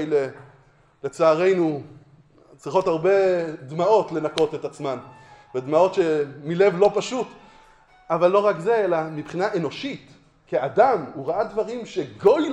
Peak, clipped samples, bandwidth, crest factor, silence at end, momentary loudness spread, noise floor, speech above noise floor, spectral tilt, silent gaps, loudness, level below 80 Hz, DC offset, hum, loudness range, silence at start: -4 dBFS; under 0.1%; 10.5 kHz; 18 dB; 0 s; 13 LU; -56 dBFS; 34 dB; -6 dB/octave; none; -22 LUFS; -62 dBFS; under 0.1%; none; 2 LU; 0 s